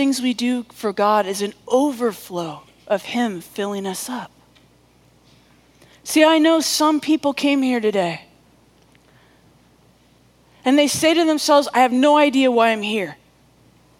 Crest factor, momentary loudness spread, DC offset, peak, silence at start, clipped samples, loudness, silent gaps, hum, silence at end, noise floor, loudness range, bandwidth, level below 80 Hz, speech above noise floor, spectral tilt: 20 dB; 14 LU; under 0.1%; 0 dBFS; 0 s; under 0.1%; -18 LUFS; none; none; 0.85 s; -55 dBFS; 10 LU; 16.5 kHz; -64 dBFS; 37 dB; -3.5 dB/octave